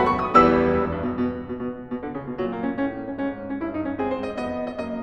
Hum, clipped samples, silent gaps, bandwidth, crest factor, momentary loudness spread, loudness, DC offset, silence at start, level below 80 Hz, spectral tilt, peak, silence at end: none; under 0.1%; none; 8.8 kHz; 22 dB; 14 LU; -24 LUFS; 0.2%; 0 s; -46 dBFS; -8 dB/octave; -2 dBFS; 0 s